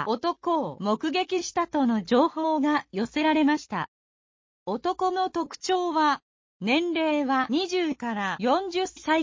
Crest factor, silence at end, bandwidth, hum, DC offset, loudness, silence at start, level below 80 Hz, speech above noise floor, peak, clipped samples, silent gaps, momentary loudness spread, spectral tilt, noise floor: 16 dB; 0 s; 7.6 kHz; none; under 0.1%; -26 LUFS; 0 s; -64 dBFS; over 65 dB; -10 dBFS; under 0.1%; 3.88-4.66 s, 6.22-6.60 s; 7 LU; -4.5 dB/octave; under -90 dBFS